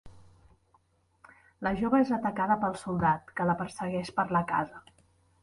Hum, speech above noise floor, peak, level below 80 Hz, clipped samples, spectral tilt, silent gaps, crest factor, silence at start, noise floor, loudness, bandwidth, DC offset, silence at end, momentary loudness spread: none; 39 dB; -12 dBFS; -58 dBFS; under 0.1%; -7 dB/octave; none; 18 dB; 0.05 s; -68 dBFS; -29 LUFS; 11.5 kHz; under 0.1%; 0.65 s; 7 LU